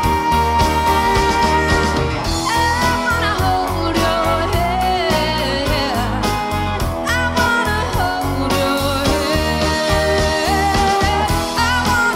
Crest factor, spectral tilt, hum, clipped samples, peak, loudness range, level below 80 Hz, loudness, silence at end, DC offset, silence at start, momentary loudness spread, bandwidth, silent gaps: 14 dB; -4.5 dB/octave; none; under 0.1%; -2 dBFS; 2 LU; -26 dBFS; -16 LUFS; 0 s; under 0.1%; 0 s; 4 LU; 16.5 kHz; none